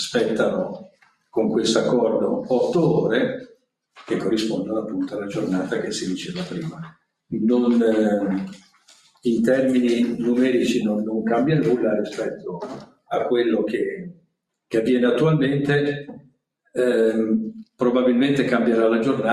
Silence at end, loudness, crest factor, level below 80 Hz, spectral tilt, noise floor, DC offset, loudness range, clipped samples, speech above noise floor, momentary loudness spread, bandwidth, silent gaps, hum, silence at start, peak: 0 s; -21 LUFS; 16 dB; -62 dBFS; -6 dB/octave; -69 dBFS; under 0.1%; 4 LU; under 0.1%; 48 dB; 13 LU; 12.5 kHz; none; none; 0 s; -4 dBFS